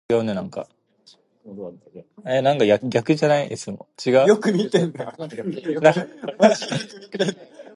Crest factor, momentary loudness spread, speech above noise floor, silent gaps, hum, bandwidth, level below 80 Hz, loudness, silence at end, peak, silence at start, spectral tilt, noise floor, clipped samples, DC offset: 20 dB; 19 LU; 35 dB; none; none; 11.5 kHz; -66 dBFS; -20 LUFS; 0.15 s; 0 dBFS; 0.1 s; -5.5 dB/octave; -56 dBFS; under 0.1%; under 0.1%